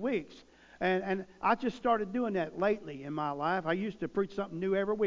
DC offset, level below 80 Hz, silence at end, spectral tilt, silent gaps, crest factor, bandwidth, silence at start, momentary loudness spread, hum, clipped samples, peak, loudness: under 0.1%; -64 dBFS; 0 s; -7 dB/octave; none; 18 dB; 7.6 kHz; 0 s; 6 LU; none; under 0.1%; -14 dBFS; -33 LUFS